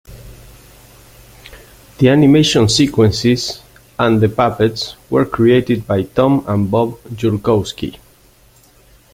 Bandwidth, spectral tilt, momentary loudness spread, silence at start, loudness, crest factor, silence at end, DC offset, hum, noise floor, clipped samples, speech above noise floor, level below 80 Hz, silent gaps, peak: 16.5 kHz; -6 dB/octave; 13 LU; 0.1 s; -14 LUFS; 14 dB; 1.2 s; under 0.1%; none; -49 dBFS; under 0.1%; 35 dB; -42 dBFS; none; 0 dBFS